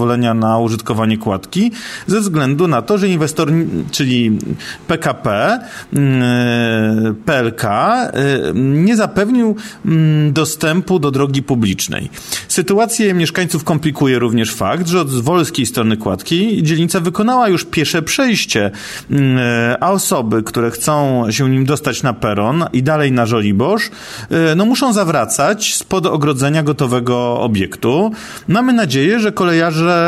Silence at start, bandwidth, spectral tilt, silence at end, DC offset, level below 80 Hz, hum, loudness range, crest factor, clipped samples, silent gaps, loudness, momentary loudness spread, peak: 0 s; 15.5 kHz; -5 dB/octave; 0 s; under 0.1%; -48 dBFS; none; 1 LU; 12 dB; under 0.1%; none; -14 LUFS; 5 LU; -2 dBFS